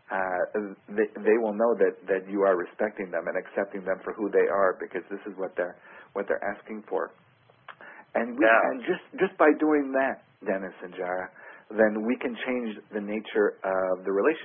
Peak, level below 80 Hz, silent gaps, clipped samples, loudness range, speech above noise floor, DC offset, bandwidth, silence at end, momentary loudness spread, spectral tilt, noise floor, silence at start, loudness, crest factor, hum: -6 dBFS; -70 dBFS; none; under 0.1%; 5 LU; 24 dB; under 0.1%; 3.7 kHz; 0 s; 13 LU; -10 dB/octave; -51 dBFS; 0.1 s; -27 LUFS; 20 dB; none